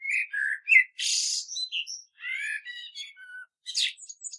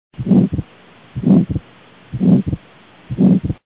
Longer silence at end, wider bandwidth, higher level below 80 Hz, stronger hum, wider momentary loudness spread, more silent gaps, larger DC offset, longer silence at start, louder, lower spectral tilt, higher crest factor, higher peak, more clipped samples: about the same, 0 s vs 0.1 s; first, 11.5 kHz vs 4 kHz; second, under -90 dBFS vs -36 dBFS; neither; first, 21 LU vs 15 LU; neither; second, under 0.1% vs 0.1%; second, 0 s vs 0.2 s; second, -25 LUFS vs -16 LUFS; second, 12 dB/octave vs -13.5 dB/octave; first, 24 dB vs 16 dB; second, -6 dBFS vs 0 dBFS; neither